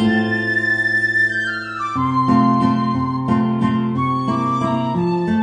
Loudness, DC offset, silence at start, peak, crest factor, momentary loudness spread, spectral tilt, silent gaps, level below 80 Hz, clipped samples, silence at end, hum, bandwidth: -18 LUFS; under 0.1%; 0 s; -4 dBFS; 14 dB; 6 LU; -7 dB/octave; none; -52 dBFS; under 0.1%; 0 s; none; 9.6 kHz